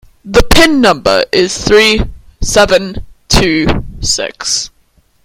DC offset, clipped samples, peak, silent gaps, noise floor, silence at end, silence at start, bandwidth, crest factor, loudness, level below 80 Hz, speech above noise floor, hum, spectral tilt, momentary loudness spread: under 0.1%; 1%; 0 dBFS; none; -52 dBFS; 0.6 s; 0.25 s; over 20 kHz; 12 dB; -10 LUFS; -22 dBFS; 42 dB; none; -3.5 dB/octave; 11 LU